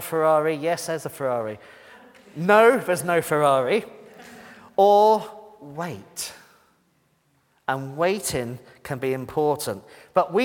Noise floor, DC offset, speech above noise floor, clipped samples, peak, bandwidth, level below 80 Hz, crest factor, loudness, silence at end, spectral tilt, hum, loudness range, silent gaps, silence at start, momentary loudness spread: -66 dBFS; under 0.1%; 44 dB; under 0.1%; -2 dBFS; 18 kHz; -62 dBFS; 20 dB; -22 LUFS; 0 s; -4.5 dB/octave; none; 10 LU; none; 0 s; 22 LU